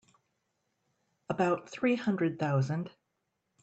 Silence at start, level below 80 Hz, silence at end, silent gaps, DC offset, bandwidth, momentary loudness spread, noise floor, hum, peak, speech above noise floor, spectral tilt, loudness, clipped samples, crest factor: 1.3 s; -74 dBFS; 0.75 s; none; under 0.1%; 8.2 kHz; 8 LU; -82 dBFS; none; -16 dBFS; 52 dB; -7.5 dB/octave; -31 LUFS; under 0.1%; 18 dB